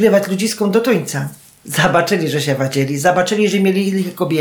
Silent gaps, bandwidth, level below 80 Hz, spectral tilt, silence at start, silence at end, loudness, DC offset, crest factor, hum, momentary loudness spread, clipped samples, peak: none; over 20 kHz; -54 dBFS; -5 dB/octave; 0 s; 0 s; -16 LUFS; under 0.1%; 14 dB; none; 6 LU; under 0.1%; -2 dBFS